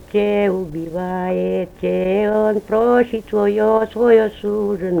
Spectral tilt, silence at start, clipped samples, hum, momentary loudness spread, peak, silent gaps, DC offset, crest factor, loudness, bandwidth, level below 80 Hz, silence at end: -8 dB/octave; 0 s; under 0.1%; none; 8 LU; -2 dBFS; none; under 0.1%; 16 dB; -18 LUFS; 11 kHz; -46 dBFS; 0 s